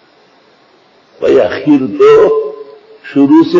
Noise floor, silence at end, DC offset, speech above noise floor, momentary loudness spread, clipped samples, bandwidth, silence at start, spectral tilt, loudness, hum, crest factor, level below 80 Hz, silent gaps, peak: -47 dBFS; 0 s; under 0.1%; 39 dB; 12 LU; 0.5%; 7.4 kHz; 1.2 s; -7.5 dB/octave; -9 LUFS; none; 10 dB; -50 dBFS; none; 0 dBFS